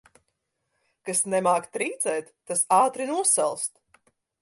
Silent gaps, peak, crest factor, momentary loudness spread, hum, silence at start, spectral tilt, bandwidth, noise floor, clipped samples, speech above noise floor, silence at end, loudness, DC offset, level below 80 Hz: none; -6 dBFS; 20 dB; 11 LU; none; 1.05 s; -2.5 dB/octave; 12 kHz; -78 dBFS; under 0.1%; 53 dB; 0.75 s; -24 LUFS; under 0.1%; -76 dBFS